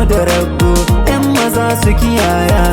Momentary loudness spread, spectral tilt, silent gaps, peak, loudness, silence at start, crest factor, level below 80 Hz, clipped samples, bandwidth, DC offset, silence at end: 1 LU; -5.5 dB/octave; none; 0 dBFS; -12 LUFS; 0 s; 10 dB; -16 dBFS; under 0.1%; 18.5 kHz; under 0.1%; 0 s